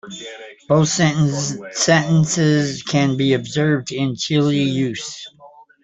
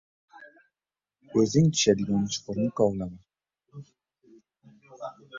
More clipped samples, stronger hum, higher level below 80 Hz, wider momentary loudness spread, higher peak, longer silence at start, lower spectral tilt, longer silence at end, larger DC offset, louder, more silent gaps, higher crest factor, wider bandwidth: neither; neither; first, -54 dBFS vs -60 dBFS; second, 17 LU vs 23 LU; first, -2 dBFS vs -6 dBFS; second, 0.05 s vs 0.4 s; about the same, -5 dB/octave vs -5.5 dB/octave; first, 0.35 s vs 0 s; neither; first, -18 LUFS vs -25 LUFS; neither; second, 16 dB vs 22 dB; about the same, 8.4 kHz vs 7.8 kHz